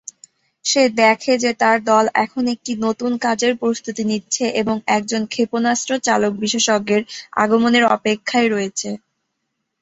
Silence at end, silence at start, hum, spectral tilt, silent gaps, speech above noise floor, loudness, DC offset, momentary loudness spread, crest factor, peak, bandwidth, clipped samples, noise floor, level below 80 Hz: 0.85 s; 0.65 s; none; -3 dB/octave; none; 57 dB; -18 LUFS; under 0.1%; 8 LU; 18 dB; -2 dBFS; 8.2 kHz; under 0.1%; -75 dBFS; -62 dBFS